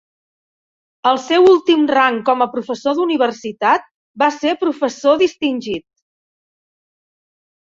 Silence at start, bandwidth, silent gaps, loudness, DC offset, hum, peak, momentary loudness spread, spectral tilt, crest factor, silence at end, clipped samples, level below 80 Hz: 1.05 s; 7.6 kHz; 3.91-4.14 s; -16 LUFS; under 0.1%; none; 0 dBFS; 9 LU; -4 dB/octave; 16 dB; 1.95 s; under 0.1%; -62 dBFS